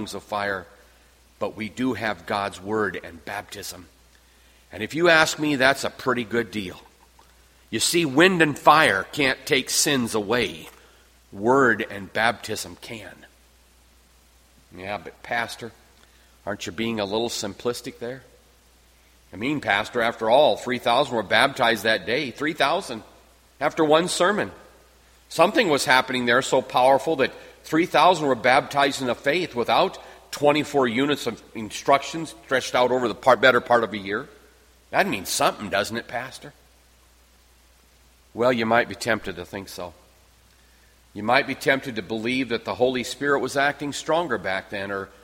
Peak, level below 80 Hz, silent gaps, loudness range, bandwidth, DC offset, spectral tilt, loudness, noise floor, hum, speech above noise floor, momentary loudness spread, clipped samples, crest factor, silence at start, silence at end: -2 dBFS; -58 dBFS; none; 10 LU; 16.5 kHz; under 0.1%; -3.5 dB/octave; -22 LUFS; -56 dBFS; none; 33 dB; 16 LU; under 0.1%; 22 dB; 0 s; 0.15 s